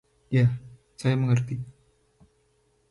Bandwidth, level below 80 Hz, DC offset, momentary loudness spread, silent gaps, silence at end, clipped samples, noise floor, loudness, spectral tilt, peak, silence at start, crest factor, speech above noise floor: 11.5 kHz; -58 dBFS; under 0.1%; 14 LU; none; 1.2 s; under 0.1%; -67 dBFS; -26 LUFS; -7.5 dB/octave; -12 dBFS; 0.3 s; 16 dB; 44 dB